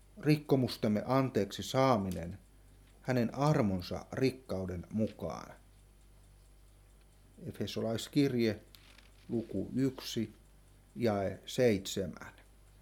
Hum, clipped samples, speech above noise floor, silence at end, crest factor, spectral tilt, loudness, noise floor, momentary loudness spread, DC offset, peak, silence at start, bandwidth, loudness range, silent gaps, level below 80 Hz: none; under 0.1%; 28 dB; 0.5 s; 20 dB; -6.5 dB/octave; -34 LUFS; -61 dBFS; 16 LU; under 0.1%; -14 dBFS; 0.15 s; 18.5 kHz; 7 LU; none; -60 dBFS